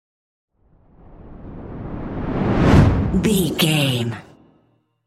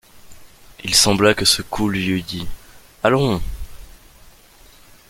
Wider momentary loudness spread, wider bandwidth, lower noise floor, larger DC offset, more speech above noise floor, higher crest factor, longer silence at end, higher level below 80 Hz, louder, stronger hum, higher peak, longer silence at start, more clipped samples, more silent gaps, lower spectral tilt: about the same, 21 LU vs 20 LU; about the same, 16 kHz vs 17 kHz; first, -62 dBFS vs -47 dBFS; neither; first, 43 dB vs 30 dB; about the same, 18 dB vs 22 dB; second, 0.85 s vs 1.2 s; first, -32 dBFS vs -38 dBFS; about the same, -18 LUFS vs -17 LUFS; neither; about the same, -2 dBFS vs 0 dBFS; first, 1.1 s vs 0.15 s; neither; neither; first, -6 dB/octave vs -3.5 dB/octave